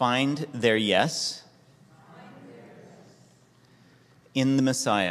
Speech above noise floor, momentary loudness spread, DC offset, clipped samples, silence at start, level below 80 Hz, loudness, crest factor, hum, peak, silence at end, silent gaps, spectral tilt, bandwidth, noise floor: 34 dB; 25 LU; under 0.1%; under 0.1%; 0 s; -68 dBFS; -25 LUFS; 24 dB; none; -4 dBFS; 0 s; none; -4 dB/octave; 14 kHz; -58 dBFS